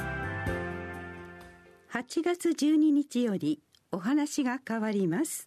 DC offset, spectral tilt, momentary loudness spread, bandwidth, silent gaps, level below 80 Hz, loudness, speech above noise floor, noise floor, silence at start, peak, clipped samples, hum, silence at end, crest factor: under 0.1%; -5.5 dB/octave; 16 LU; 13.5 kHz; none; -54 dBFS; -30 LUFS; 25 dB; -53 dBFS; 0 s; -14 dBFS; under 0.1%; none; 0 s; 16 dB